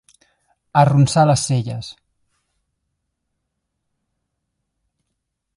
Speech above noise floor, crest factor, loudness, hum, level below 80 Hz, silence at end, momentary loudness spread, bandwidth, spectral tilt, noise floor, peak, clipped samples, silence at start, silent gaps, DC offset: 61 dB; 22 dB; -16 LUFS; none; -54 dBFS; 3.65 s; 16 LU; 11.5 kHz; -6 dB/octave; -76 dBFS; 0 dBFS; under 0.1%; 0.75 s; none; under 0.1%